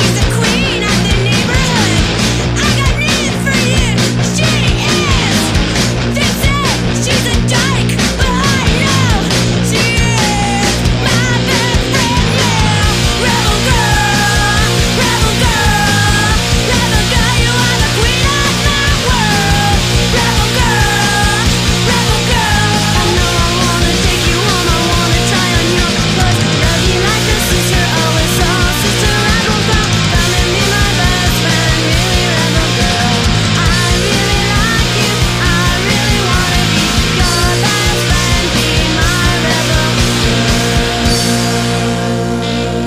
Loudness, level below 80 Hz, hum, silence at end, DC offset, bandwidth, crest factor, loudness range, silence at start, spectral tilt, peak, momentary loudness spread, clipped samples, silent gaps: -11 LUFS; -20 dBFS; none; 0 s; under 0.1%; 15.5 kHz; 12 dB; 1 LU; 0 s; -4 dB/octave; 0 dBFS; 2 LU; under 0.1%; none